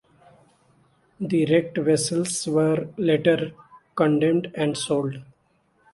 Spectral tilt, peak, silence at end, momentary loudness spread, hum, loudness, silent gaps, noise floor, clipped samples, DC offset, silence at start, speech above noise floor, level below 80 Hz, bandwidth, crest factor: -5.5 dB/octave; -6 dBFS; 0.7 s; 11 LU; none; -23 LUFS; none; -65 dBFS; under 0.1%; under 0.1%; 1.2 s; 43 dB; -64 dBFS; 11.5 kHz; 18 dB